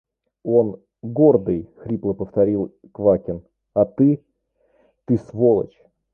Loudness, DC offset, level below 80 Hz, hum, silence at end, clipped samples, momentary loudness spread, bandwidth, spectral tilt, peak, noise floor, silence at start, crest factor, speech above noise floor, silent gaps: -20 LUFS; under 0.1%; -52 dBFS; none; 0.5 s; under 0.1%; 15 LU; 2.6 kHz; -12.5 dB/octave; -2 dBFS; -65 dBFS; 0.45 s; 18 dB; 46 dB; none